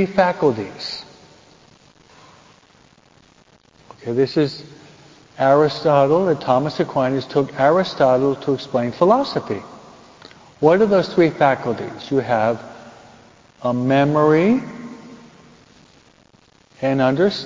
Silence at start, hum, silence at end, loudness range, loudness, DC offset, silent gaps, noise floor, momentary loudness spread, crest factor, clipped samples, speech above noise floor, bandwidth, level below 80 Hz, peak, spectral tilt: 0 s; none; 0 s; 9 LU; -18 LUFS; under 0.1%; none; -54 dBFS; 14 LU; 18 dB; under 0.1%; 36 dB; 7.6 kHz; -58 dBFS; 0 dBFS; -7 dB/octave